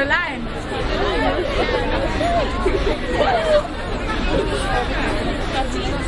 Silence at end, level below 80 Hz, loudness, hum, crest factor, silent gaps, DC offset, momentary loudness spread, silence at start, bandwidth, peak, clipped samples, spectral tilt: 0 s; -26 dBFS; -21 LUFS; none; 14 dB; none; under 0.1%; 6 LU; 0 s; 11.5 kHz; -6 dBFS; under 0.1%; -5.5 dB/octave